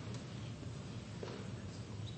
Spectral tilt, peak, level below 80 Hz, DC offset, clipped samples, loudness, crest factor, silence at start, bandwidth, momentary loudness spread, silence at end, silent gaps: -6 dB/octave; -32 dBFS; -62 dBFS; under 0.1%; under 0.1%; -47 LUFS; 14 dB; 0 s; 8.4 kHz; 1 LU; 0 s; none